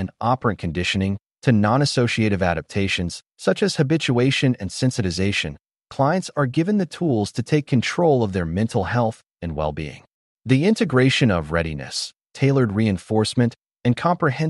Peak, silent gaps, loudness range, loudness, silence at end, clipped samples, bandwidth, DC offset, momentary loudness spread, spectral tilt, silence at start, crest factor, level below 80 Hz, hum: -6 dBFS; 10.14-10.37 s; 2 LU; -21 LUFS; 0 s; under 0.1%; 11.5 kHz; under 0.1%; 8 LU; -6 dB/octave; 0 s; 16 dB; -46 dBFS; none